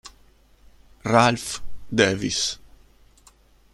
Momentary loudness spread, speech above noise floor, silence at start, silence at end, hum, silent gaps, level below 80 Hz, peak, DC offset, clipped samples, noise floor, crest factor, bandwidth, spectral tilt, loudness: 16 LU; 34 dB; 0.05 s; 1.05 s; none; none; -48 dBFS; -2 dBFS; under 0.1%; under 0.1%; -55 dBFS; 24 dB; 13 kHz; -3.5 dB/octave; -22 LUFS